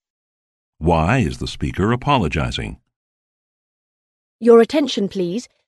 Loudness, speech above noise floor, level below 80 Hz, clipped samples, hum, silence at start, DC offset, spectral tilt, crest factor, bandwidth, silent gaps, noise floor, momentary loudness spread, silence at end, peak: -18 LUFS; over 73 dB; -36 dBFS; under 0.1%; none; 0.8 s; under 0.1%; -6.5 dB/octave; 18 dB; 12 kHz; 2.96-4.39 s; under -90 dBFS; 12 LU; 0.2 s; 0 dBFS